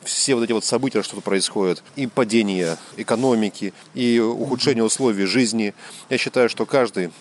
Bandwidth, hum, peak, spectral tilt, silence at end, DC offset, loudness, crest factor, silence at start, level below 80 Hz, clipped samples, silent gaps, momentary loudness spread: 12 kHz; none; -4 dBFS; -4 dB/octave; 0.1 s; under 0.1%; -21 LUFS; 16 dB; 0 s; -72 dBFS; under 0.1%; none; 7 LU